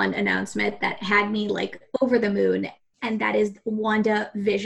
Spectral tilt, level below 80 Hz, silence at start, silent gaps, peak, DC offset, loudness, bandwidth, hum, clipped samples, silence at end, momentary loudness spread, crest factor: -5.5 dB/octave; -62 dBFS; 0 s; none; -8 dBFS; under 0.1%; -24 LUFS; 11.5 kHz; none; under 0.1%; 0 s; 7 LU; 16 dB